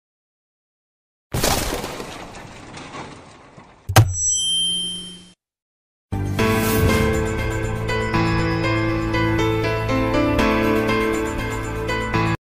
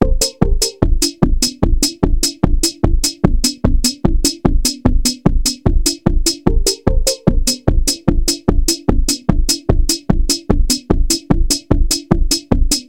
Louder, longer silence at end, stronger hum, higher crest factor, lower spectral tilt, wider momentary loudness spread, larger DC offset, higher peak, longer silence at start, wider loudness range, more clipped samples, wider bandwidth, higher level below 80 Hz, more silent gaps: second, -20 LUFS vs -16 LUFS; about the same, 0.05 s vs 0.05 s; neither; about the same, 18 dB vs 14 dB; about the same, -4 dB/octave vs -4 dB/octave; first, 17 LU vs 1 LU; neither; second, -4 dBFS vs 0 dBFS; first, 1.3 s vs 0 s; first, 6 LU vs 0 LU; second, under 0.1% vs 0.2%; about the same, 16 kHz vs 17 kHz; second, -34 dBFS vs -16 dBFS; first, 5.62-6.09 s vs none